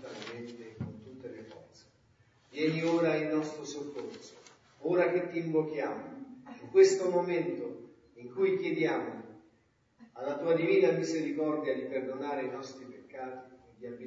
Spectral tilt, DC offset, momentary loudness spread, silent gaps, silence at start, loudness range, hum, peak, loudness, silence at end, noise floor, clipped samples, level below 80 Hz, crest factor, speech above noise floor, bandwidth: -6 dB/octave; under 0.1%; 21 LU; none; 0 s; 5 LU; none; -10 dBFS; -31 LUFS; 0 s; -70 dBFS; under 0.1%; -78 dBFS; 22 dB; 39 dB; 7.8 kHz